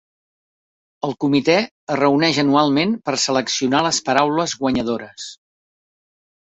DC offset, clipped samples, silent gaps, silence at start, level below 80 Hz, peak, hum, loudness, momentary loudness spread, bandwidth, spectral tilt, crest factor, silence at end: under 0.1%; under 0.1%; 1.71-1.87 s; 1.05 s; -56 dBFS; -2 dBFS; none; -18 LUFS; 11 LU; 8.2 kHz; -4 dB/octave; 18 dB; 1.15 s